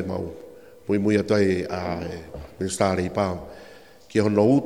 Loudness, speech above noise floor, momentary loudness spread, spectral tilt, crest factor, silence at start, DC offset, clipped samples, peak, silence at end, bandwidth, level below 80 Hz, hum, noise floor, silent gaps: -24 LUFS; 25 dB; 19 LU; -6.5 dB/octave; 18 dB; 0 s; 0.2%; under 0.1%; -6 dBFS; 0 s; 15.5 kHz; -50 dBFS; none; -48 dBFS; none